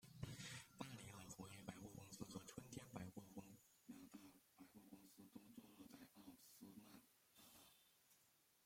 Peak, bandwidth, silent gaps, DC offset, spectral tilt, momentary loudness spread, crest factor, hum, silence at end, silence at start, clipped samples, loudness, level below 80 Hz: -36 dBFS; 16.5 kHz; none; under 0.1%; -4.5 dB/octave; 11 LU; 26 dB; none; 0 s; 0 s; under 0.1%; -60 LUFS; -82 dBFS